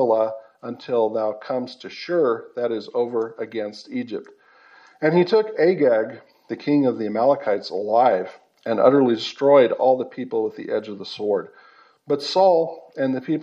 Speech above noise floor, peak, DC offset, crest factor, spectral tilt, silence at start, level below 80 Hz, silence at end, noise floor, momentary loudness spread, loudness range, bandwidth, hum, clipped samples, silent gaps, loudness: 31 dB; -2 dBFS; under 0.1%; 20 dB; -6.5 dB/octave; 0 s; -82 dBFS; 0 s; -51 dBFS; 14 LU; 6 LU; 8 kHz; none; under 0.1%; none; -21 LUFS